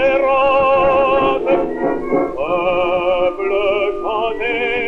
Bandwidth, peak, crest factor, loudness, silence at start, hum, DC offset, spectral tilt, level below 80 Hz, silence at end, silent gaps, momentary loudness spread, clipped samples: 5.8 kHz; -4 dBFS; 12 dB; -16 LUFS; 0 s; none; under 0.1%; -6.5 dB/octave; -40 dBFS; 0 s; none; 6 LU; under 0.1%